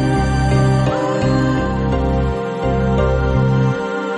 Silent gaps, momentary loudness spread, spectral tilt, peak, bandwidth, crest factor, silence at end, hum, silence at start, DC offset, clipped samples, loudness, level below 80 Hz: none; 4 LU; -7.5 dB/octave; -4 dBFS; 10.5 kHz; 12 dB; 0 s; none; 0 s; under 0.1%; under 0.1%; -17 LUFS; -24 dBFS